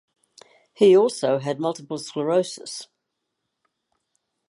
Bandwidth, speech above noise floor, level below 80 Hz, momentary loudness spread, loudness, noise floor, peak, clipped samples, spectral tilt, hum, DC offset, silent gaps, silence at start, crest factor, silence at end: 11.5 kHz; 58 dB; -78 dBFS; 17 LU; -21 LUFS; -79 dBFS; -6 dBFS; under 0.1%; -5.5 dB/octave; none; under 0.1%; none; 0.8 s; 18 dB; 1.65 s